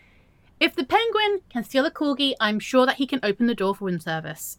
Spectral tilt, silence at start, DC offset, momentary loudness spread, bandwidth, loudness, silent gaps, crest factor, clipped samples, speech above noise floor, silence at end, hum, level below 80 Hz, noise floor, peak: -4 dB/octave; 0.6 s; under 0.1%; 8 LU; 17.5 kHz; -23 LUFS; none; 18 dB; under 0.1%; 33 dB; 0.05 s; none; -60 dBFS; -56 dBFS; -6 dBFS